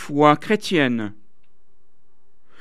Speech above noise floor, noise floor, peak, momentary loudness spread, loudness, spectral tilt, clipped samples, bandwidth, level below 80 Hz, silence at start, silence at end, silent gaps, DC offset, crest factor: 50 dB; -68 dBFS; 0 dBFS; 11 LU; -19 LUFS; -5.5 dB/octave; under 0.1%; 14 kHz; -68 dBFS; 0 s; 1.5 s; none; 2%; 22 dB